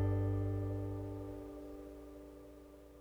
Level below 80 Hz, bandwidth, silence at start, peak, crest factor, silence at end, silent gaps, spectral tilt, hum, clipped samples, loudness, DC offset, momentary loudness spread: -52 dBFS; 3.9 kHz; 0 s; -26 dBFS; 14 dB; 0 s; none; -9.5 dB/octave; none; under 0.1%; -41 LUFS; under 0.1%; 19 LU